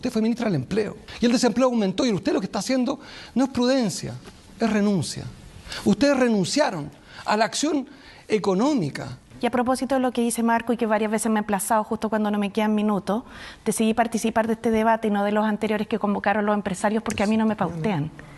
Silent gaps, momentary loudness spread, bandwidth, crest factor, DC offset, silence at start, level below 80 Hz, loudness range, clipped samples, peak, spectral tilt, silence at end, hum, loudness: none; 9 LU; 12.5 kHz; 16 dB; under 0.1%; 0 s; -54 dBFS; 2 LU; under 0.1%; -6 dBFS; -5 dB/octave; 0 s; none; -23 LUFS